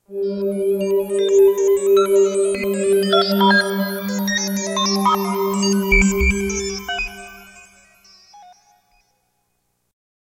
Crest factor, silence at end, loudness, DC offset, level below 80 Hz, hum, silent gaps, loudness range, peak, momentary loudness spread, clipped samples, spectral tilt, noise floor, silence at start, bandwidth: 18 dB; 2 s; -18 LUFS; under 0.1%; -34 dBFS; 60 Hz at -65 dBFS; none; 12 LU; -2 dBFS; 10 LU; under 0.1%; -4 dB/octave; -69 dBFS; 0.1 s; 16.5 kHz